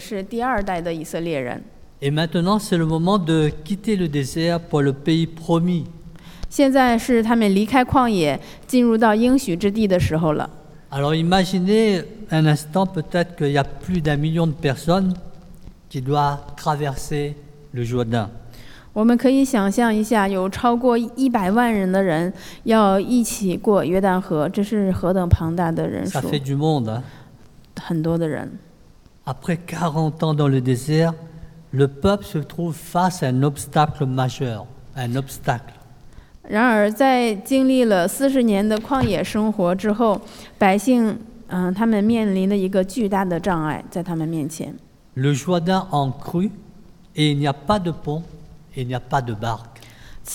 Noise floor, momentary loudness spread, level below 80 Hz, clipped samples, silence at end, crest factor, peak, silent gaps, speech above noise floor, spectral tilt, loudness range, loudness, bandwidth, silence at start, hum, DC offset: -48 dBFS; 12 LU; -42 dBFS; under 0.1%; 0 s; 18 dB; -2 dBFS; none; 29 dB; -6.5 dB/octave; 6 LU; -20 LUFS; 17.5 kHz; 0 s; none; under 0.1%